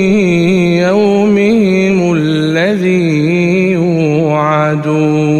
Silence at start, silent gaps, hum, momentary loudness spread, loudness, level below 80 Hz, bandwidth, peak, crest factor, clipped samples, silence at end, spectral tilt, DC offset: 0 s; none; none; 2 LU; -11 LUFS; -46 dBFS; 10 kHz; -2 dBFS; 10 dB; under 0.1%; 0 s; -7 dB/octave; under 0.1%